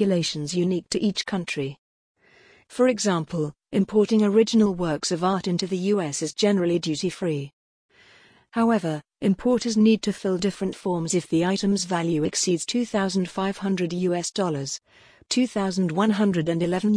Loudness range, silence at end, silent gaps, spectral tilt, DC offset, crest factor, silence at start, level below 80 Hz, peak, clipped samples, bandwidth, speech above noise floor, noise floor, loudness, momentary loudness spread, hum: 4 LU; 0 s; 1.78-2.15 s, 7.53-7.89 s; -5 dB/octave; under 0.1%; 16 dB; 0 s; -58 dBFS; -8 dBFS; under 0.1%; 10.5 kHz; 33 dB; -56 dBFS; -24 LUFS; 8 LU; none